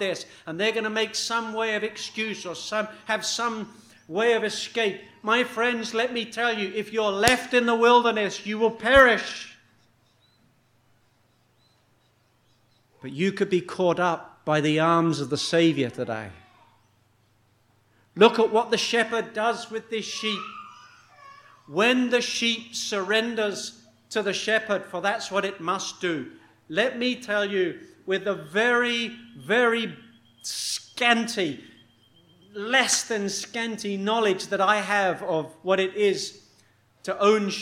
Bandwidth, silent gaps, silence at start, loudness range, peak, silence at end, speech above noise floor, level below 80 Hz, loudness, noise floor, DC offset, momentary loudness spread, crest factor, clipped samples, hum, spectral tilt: 16 kHz; none; 0 s; 6 LU; 0 dBFS; 0 s; 40 dB; -58 dBFS; -24 LUFS; -65 dBFS; under 0.1%; 13 LU; 26 dB; under 0.1%; none; -3.5 dB/octave